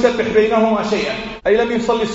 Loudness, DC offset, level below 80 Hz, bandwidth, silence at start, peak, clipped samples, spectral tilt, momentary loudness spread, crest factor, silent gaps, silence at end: -16 LUFS; under 0.1%; -42 dBFS; 8 kHz; 0 s; 0 dBFS; under 0.1%; -3.5 dB/octave; 6 LU; 16 dB; none; 0 s